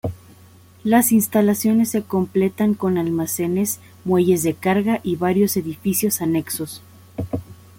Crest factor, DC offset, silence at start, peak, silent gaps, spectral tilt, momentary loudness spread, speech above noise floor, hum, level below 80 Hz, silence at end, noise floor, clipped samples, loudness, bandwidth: 16 dB; under 0.1%; 0.05 s; -4 dBFS; none; -5.5 dB/octave; 12 LU; 29 dB; none; -54 dBFS; 0.25 s; -47 dBFS; under 0.1%; -20 LUFS; 17 kHz